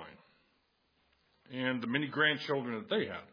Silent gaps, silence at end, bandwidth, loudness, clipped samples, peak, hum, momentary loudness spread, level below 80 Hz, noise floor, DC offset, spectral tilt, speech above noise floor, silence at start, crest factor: none; 0.05 s; 5.2 kHz; -33 LUFS; under 0.1%; -16 dBFS; none; 10 LU; -80 dBFS; -75 dBFS; under 0.1%; -6.5 dB/octave; 41 dB; 0 s; 22 dB